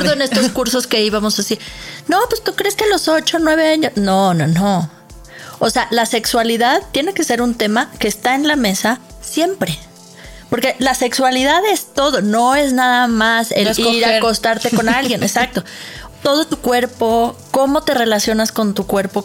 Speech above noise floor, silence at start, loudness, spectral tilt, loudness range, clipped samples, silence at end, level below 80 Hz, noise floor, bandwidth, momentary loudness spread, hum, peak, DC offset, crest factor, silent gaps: 22 dB; 0 s; -15 LUFS; -3.5 dB/octave; 3 LU; under 0.1%; 0 s; -42 dBFS; -37 dBFS; 17 kHz; 7 LU; none; -2 dBFS; under 0.1%; 12 dB; none